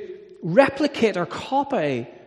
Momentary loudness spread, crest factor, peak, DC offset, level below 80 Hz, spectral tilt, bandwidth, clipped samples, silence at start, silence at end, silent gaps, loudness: 11 LU; 22 dB; 0 dBFS; under 0.1%; -60 dBFS; -6 dB/octave; 11 kHz; under 0.1%; 0 s; 0.1 s; none; -22 LUFS